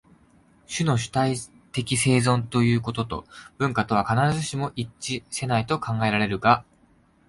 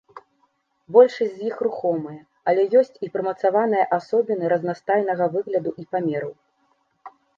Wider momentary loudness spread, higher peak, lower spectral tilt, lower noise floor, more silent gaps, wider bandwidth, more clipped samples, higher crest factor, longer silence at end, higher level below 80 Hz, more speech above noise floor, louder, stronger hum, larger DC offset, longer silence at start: about the same, 10 LU vs 10 LU; about the same, -4 dBFS vs -2 dBFS; second, -5 dB/octave vs -7.5 dB/octave; second, -59 dBFS vs -67 dBFS; neither; first, 11.5 kHz vs 7.2 kHz; neither; about the same, 20 dB vs 20 dB; first, 0.65 s vs 0.3 s; first, -52 dBFS vs -74 dBFS; second, 36 dB vs 46 dB; about the same, -24 LUFS vs -22 LUFS; neither; neither; first, 0.7 s vs 0.15 s